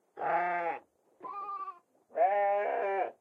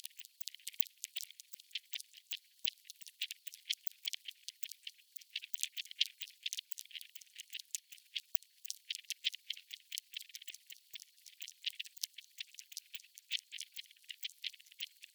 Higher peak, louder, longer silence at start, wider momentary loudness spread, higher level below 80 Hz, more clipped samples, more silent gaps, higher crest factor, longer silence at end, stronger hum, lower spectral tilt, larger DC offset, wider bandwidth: second, -18 dBFS vs -4 dBFS; first, -32 LUFS vs -37 LUFS; about the same, 0.15 s vs 0.05 s; about the same, 16 LU vs 17 LU; about the same, under -90 dBFS vs under -90 dBFS; neither; neither; second, 16 dB vs 36 dB; about the same, 0.1 s vs 0.1 s; neither; first, -6.5 dB/octave vs 10 dB/octave; neither; second, 5.2 kHz vs over 20 kHz